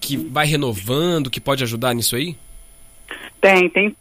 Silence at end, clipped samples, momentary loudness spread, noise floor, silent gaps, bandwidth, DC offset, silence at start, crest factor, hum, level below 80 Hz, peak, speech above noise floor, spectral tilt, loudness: 0.05 s; under 0.1%; 19 LU; -43 dBFS; none; 16 kHz; under 0.1%; 0 s; 18 dB; none; -46 dBFS; -2 dBFS; 25 dB; -4 dB/octave; -18 LUFS